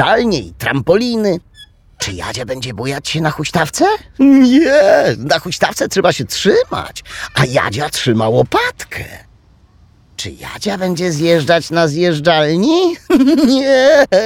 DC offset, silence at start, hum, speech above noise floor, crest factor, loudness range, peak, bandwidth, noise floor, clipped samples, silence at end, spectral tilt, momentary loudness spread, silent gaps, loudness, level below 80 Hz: under 0.1%; 0 s; none; 34 dB; 12 dB; 6 LU; 0 dBFS; 17 kHz; -47 dBFS; under 0.1%; 0 s; -5 dB/octave; 14 LU; none; -13 LUFS; -42 dBFS